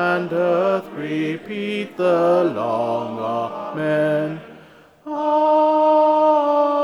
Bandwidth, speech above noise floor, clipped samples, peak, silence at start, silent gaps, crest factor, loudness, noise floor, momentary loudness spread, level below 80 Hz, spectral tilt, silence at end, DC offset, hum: 11 kHz; 27 dB; under 0.1%; -6 dBFS; 0 s; none; 14 dB; -19 LUFS; -47 dBFS; 10 LU; -70 dBFS; -7 dB/octave; 0 s; under 0.1%; none